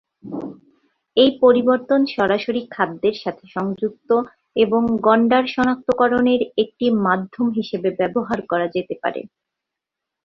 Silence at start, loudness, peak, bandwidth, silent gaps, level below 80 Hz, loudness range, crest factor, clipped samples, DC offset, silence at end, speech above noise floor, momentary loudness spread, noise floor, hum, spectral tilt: 0.25 s; -19 LUFS; -2 dBFS; 6.8 kHz; none; -58 dBFS; 4 LU; 18 dB; under 0.1%; under 0.1%; 1 s; 65 dB; 11 LU; -84 dBFS; none; -7 dB/octave